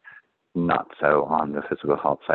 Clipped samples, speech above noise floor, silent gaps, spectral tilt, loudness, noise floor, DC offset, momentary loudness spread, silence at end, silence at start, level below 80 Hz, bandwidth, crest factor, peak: under 0.1%; 28 dB; none; -9.5 dB/octave; -24 LUFS; -50 dBFS; under 0.1%; 7 LU; 0 s; 0.15 s; -58 dBFS; 4.3 kHz; 20 dB; -4 dBFS